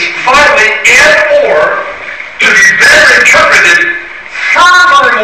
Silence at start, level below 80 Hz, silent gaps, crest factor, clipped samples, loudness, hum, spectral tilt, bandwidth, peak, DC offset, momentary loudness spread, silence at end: 0 s; -38 dBFS; none; 6 dB; 2%; -3 LUFS; none; -0.5 dB/octave; 16 kHz; 0 dBFS; under 0.1%; 13 LU; 0 s